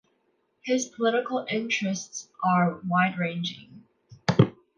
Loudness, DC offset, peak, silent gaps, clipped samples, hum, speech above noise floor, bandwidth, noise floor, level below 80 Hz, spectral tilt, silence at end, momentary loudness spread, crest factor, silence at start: -26 LUFS; under 0.1%; -2 dBFS; none; under 0.1%; none; 45 dB; 10 kHz; -71 dBFS; -62 dBFS; -5 dB/octave; 0.25 s; 10 LU; 24 dB; 0.65 s